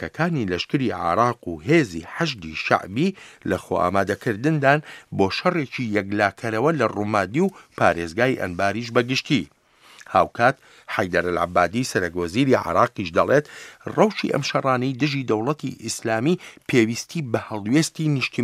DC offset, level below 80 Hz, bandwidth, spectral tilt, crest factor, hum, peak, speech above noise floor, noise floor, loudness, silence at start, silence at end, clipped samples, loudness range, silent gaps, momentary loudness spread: under 0.1%; -56 dBFS; 15.5 kHz; -5.5 dB/octave; 22 dB; none; 0 dBFS; 27 dB; -49 dBFS; -22 LUFS; 0 s; 0 s; under 0.1%; 2 LU; none; 7 LU